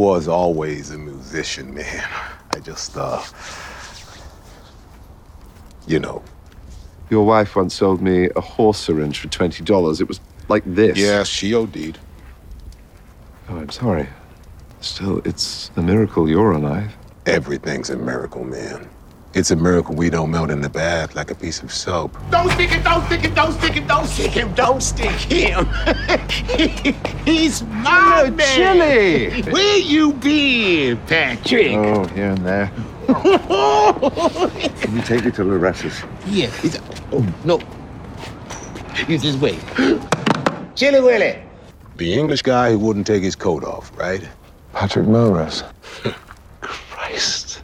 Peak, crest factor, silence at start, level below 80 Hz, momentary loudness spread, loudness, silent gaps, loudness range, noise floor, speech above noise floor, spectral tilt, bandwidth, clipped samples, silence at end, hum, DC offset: -2 dBFS; 16 dB; 0 s; -34 dBFS; 16 LU; -18 LUFS; none; 12 LU; -43 dBFS; 25 dB; -5 dB/octave; 15.5 kHz; under 0.1%; 0 s; none; under 0.1%